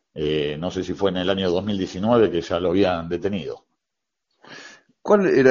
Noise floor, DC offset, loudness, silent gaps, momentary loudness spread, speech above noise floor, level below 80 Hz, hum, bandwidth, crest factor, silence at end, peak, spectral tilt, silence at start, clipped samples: -83 dBFS; under 0.1%; -22 LUFS; none; 18 LU; 63 dB; -52 dBFS; none; 7.4 kHz; 20 dB; 0 s; -2 dBFS; -4.5 dB/octave; 0.15 s; under 0.1%